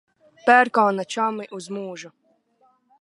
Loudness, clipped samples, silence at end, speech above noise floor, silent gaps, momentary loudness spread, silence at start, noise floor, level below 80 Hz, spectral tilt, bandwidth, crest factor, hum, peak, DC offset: -20 LUFS; under 0.1%; 0.95 s; 42 dB; none; 17 LU; 0.45 s; -63 dBFS; -78 dBFS; -4.5 dB/octave; 11.5 kHz; 22 dB; none; -2 dBFS; under 0.1%